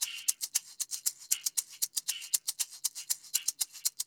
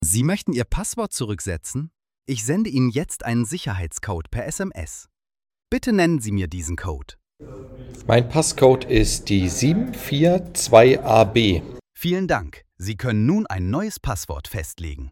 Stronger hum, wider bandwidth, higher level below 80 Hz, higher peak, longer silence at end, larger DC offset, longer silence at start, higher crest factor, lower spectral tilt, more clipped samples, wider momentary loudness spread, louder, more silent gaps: neither; first, over 20 kHz vs 18 kHz; second, under -90 dBFS vs -36 dBFS; second, -8 dBFS vs 0 dBFS; about the same, 0.05 s vs 0 s; neither; about the same, 0 s vs 0 s; first, 26 dB vs 20 dB; second, 5.5 dB/octave vs -5 dB/octave; neither; second, 4 LU vs 16 LU; second, -32 LUFS vs -21 LUFS; neither